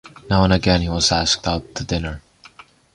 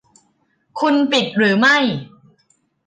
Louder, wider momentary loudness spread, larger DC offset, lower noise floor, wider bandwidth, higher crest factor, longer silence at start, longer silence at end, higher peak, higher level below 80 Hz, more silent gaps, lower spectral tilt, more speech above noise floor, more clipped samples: second, -18 LUFS vs -15 LUFS; about the same, 10 LU vs 12 LU; neither; second, -47 dBFS vs -63 dBFS; first, 11 kHz vs 9.6 kHz; about the same, 18 dB vs 14 dB; second, 0.05 s vs 0.75 s; about the same, 0.75 s vs 0.8 s; first, -2 dBFS vs -6 dBFS; first, -32 dBFS vs -66 dBFS; neither; about the same, -4.5 dB/octave vs -4.5 dB/octave; second, 28 dB vs 48 dB; neither